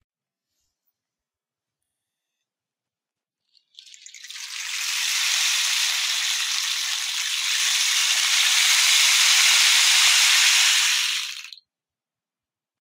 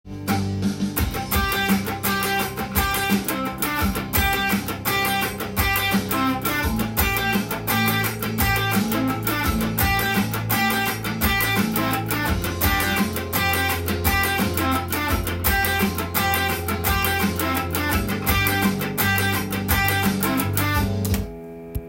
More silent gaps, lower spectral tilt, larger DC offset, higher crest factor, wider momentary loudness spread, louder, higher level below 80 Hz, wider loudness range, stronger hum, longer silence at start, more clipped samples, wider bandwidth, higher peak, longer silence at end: neither; second, 8.5 dB/octave vs -4 dB/octave; neither; about the same, 20 dB vs 18 dB; first, 12 LU vs 4 LU; first, -17 LUFS vs -21 LUFS; second, -82 dBFS vs -34 dBFS; first, 11 LU vs 1 LU; neither; first, 4.25 s vs 0.05 s; neither; about the same, 16 kHz vs 17 kHz; about the same, -2 dBFS vs -4 dBFS; first, 1.35 s vs 0 s